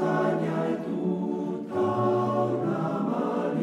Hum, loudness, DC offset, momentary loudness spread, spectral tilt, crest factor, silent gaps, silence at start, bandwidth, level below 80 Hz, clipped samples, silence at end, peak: none; -27 LUFS; under 0.1%; 4 LU; -8.5 dB/octave; 14 dB; none; 0 s; 10.5 kHz; -72 dBFS; under 0.1%; 0 s; -12 dBFS